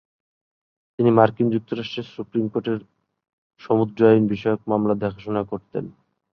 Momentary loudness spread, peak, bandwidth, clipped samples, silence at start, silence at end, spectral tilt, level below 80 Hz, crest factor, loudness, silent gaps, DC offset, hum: 14 LU; -2 dBFS; 6.2 kHz; under 0.1%; 1 s; 0.4 s; -9 dB/octave; -58 dBFS; 20 dB; -22 LUFS; 3.33-3.50 s; under 0.1%; none